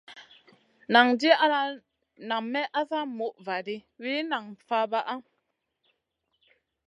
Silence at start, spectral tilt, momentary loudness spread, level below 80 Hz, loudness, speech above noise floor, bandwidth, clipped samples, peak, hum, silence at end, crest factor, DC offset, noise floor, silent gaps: 0.1 s; -4 dB/octave; 15 LU; -82 dBFS; -26 LUFS; 52 dB; 11 kHz; under 0.1%; -4 dBFS; none; 1.65 s; 24 dB; under 0.1%; -79 dBFS; none